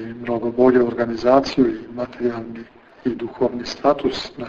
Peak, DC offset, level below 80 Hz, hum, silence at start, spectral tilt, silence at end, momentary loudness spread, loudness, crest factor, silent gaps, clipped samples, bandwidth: -4 dBFS; under 0.1%; -50 dBFS; none; 0 s; -6 dB/octave; 0 s; 13 LU; -20 LUFS; 16 dB; none; under 0.1%; 7.6 kHz